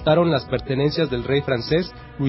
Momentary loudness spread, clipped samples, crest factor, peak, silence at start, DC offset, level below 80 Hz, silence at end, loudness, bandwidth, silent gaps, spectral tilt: 5 LU; under 0.1%; 16 dB; -4 dBFS; 0 s; under 0.1%; -42 dBFS; 0 s; -21 LUFS; 5.8 kHz; none; -10.5 dB/octave